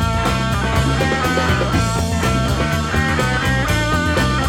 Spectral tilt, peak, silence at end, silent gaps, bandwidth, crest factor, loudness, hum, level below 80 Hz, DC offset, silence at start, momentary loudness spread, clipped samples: -5 dB/octave; -4 dBFS; 0 s; none; 17.5 kHz; 12 dB; -17 LUFS; none; -26 dBFS; under 0.1%; 0 s; 1 LU; under 0.1%